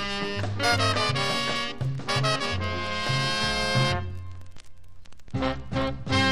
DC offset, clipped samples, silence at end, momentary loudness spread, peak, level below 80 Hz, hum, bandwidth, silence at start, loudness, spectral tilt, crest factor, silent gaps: 1%; under 0.1%; 0 s; 8 LU; -8 dBFS; -44 dBFS; none; 16 kHz; 0 s; -26 LUFS; -4 dB/octave; 18 dB; none